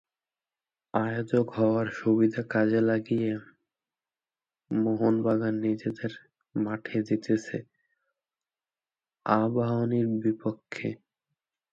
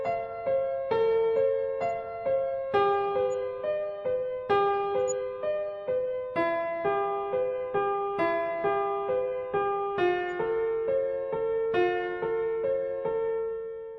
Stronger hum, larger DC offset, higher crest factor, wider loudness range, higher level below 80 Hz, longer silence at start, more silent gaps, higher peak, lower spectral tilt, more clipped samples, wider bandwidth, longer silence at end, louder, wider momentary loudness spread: neither; neither; about the same, 20 dB vs 16 dB; first, 5 LU vs 2 LU; second, -70 dBFS vs -62 dBFS; first, 0.95 s vs 0 s; neither; first, -8 dBFS vs -12 dBFS; first, -8.5 dB/octave vs -5 dB/octave; neither; about the same, 7.6 kHz vs 7.4 kHz; first, 0.8 s vs 0 s; about the same, -28 LUFS vs -29 LUFS; first, 12 LU vs 6 LU